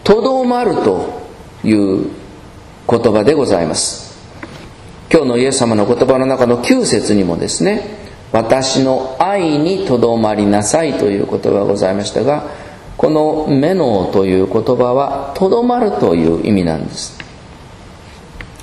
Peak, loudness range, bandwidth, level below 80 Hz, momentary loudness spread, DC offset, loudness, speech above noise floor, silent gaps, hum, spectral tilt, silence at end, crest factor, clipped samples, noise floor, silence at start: 0 dBFS; 2 LU; 12.5 kHz; -40 dBFS; 17 LU; under 0.1%; -14 LUFS; 23 dB; none; none; -5 dB/octave; 0 s; 14 dB; 0.1%; -36 dBFS; 0.05 s